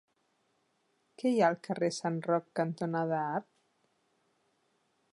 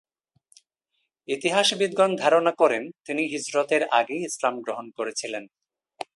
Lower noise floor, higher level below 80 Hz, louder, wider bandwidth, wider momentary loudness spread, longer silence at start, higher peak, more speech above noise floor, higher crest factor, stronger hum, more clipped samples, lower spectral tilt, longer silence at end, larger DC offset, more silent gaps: about the same, -76 dBFS vs -77 dBFS; second, -86 dBFS vs -76 dBFS; second, -32 LUFS vs -24 LUFS; about the same, 11.5 kHz vs 11.5 kHz; second, 7 LU vs 12 LU; about the same, 1.2 s vs 1.3 s; second, -14 dBFS vs -4 dBFS; second, 44 dB vs 53 dB; about the same, 22 dB vs 20 dB; neither; neither; first, -6 dB/octave vs -3 dB/octave; first, 1.7 s vs 0.1 s; neither; neither